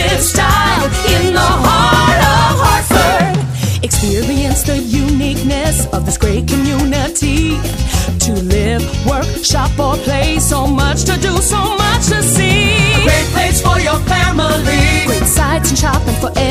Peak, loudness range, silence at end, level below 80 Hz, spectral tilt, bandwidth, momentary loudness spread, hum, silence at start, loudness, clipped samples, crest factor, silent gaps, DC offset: 0 dBFS; 4 LU; 0 s; -20 dBFS; -4 dB/octave; 15.5 kHz; 5 LU; none; 0 s; -12 LUFS; under 0.1%; 12 dB; none; under 0.1%